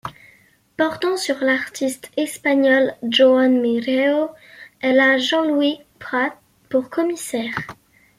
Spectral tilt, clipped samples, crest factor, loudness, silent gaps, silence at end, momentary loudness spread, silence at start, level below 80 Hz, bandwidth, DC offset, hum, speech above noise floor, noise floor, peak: -3.5 dB/octave; under 0.1%; 16 dB; -19 LUFS; none; 0.45 s; 11 LU; 0.05 s; -64 dBFS; 15.5 kHz; under 0.1%; none; 36 dB; -54 dBFS; -4 dBFS